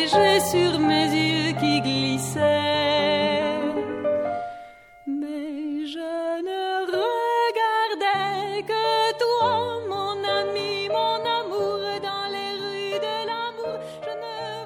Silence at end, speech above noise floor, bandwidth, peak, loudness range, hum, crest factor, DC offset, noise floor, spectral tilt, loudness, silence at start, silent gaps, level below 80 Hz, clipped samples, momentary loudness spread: 0 s; 25 dB; 17 kHz; -6 dBFS; 7 LU; none; 18 dB; under 0.1%; -45 dBFS; -4.5 dB/octave; -24 LUFS; 0 s; none; -62 dBFS; under 0.1%; 10 LU